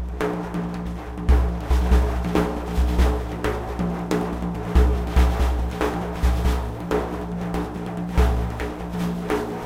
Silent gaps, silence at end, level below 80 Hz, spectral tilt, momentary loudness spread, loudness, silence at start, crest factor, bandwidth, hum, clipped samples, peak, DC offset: none; 0 s; -24 dBFS; -7 dB/octave; 8 LU; -24 LUFS; 0 s; 16 dB; 15.5 kHz; none; under 0.1%; -6 dBFS; under 0.1%